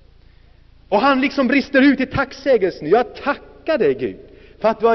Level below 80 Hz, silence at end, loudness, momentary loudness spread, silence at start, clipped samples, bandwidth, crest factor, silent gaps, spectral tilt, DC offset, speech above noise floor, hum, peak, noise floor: -48 dBFS; 0 s; -18 LUFS; 10 LU; 0.9 s; under 0.1%; 6.2 kHz; 14 dB; none; -3.5 dB/octave; under 0.1%; 31 dB; none; -4 dBFS; -48 dBFS